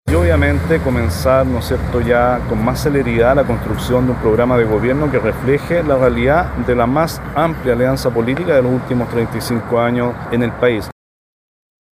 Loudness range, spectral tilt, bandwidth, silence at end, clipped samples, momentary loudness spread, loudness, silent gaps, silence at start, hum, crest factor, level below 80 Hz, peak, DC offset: 2 LU; -7 dB/octave; 16 kHz; 1 s; under 0.1%; 5 LU; -15 LUFS; none; 0.05 s; none; 14 dB; -28 dBFS; 0 dBFS; under 0.1%